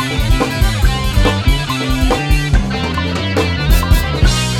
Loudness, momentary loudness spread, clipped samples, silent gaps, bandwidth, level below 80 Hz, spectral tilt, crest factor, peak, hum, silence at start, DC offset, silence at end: -15 LUFS; 4 LU; under 0.1%; none; 17.5 kHz; -16 dBFS; -5 dB/octave; 14 dB; 0 dBFS; none; 0 s; under 0.1%; 0 s